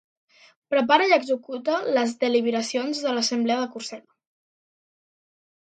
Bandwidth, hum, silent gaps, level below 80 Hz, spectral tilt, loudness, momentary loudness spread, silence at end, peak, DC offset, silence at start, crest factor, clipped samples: 9.2 kHz; none; none; -78 dBFS; -3 dB/octave; -23 LUFS; 11 LU; 1.65 s; -2 dBFS; under 0.1%; 0.7 s; 22 dB; under 0.1%